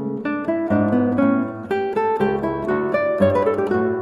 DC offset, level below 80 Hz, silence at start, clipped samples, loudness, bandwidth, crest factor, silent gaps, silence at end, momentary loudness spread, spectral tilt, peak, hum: under 0.1%; -52 dBFS; 0 s; under 0.1%; -20 LUFS; 11 kHz; 16 dB; none; 0 s; 6 LU; -9 dB/octave; -4 dBFS; none